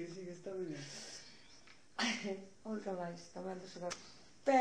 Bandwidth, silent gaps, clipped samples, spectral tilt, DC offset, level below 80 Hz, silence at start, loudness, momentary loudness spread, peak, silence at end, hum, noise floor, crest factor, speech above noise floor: 10 kHz; none; under 0.1%; -4 dB/octave; under 0.1%; -78 dBFS; 0 s; -43 LUFS; 19 LU; -20 dBFS; 0 s; none; -63 dBFS; 20 dB; 20 dB